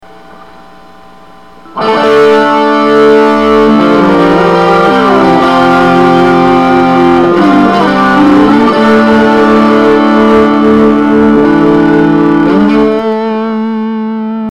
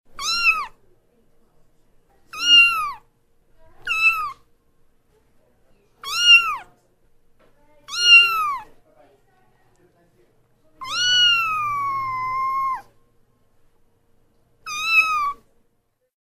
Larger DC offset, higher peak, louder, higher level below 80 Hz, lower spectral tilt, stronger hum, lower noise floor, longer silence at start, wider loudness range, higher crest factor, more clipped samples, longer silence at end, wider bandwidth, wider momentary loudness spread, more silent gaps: first, 1% vs under 0.1%; about the same, 0 dBFS vs -2 dBFS; first, -6 LUFS vs -16 LUFS; first, -36 dBFS vs -54 dBFS; first, -7 dB/octave vs 2 dB/octave; neither; second, -35 dBFS vs -67 dBFS; first, 1.75 s vs 0.1 s; second, 2 LU vs 8 LU; second, 6 dB vs 20 dB; neither; second, 0 s vs 0.9 s; second, 11 kHz vs 15.5 kHz; second, 7 LU vs 21 LU; neither